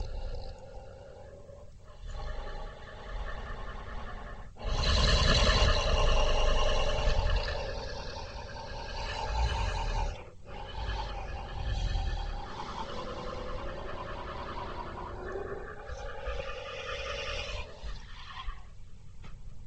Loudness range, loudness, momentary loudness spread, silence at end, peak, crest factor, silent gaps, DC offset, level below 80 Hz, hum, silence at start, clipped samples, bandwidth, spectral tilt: 15 LU; -34 LUFS; 20 LU; 0 s; -12 dBFS; 20 dB; none; under 0.1%; -34 dBFS; none; 0 s; under 0.1%; 8.8 kHz; -4 dB/octave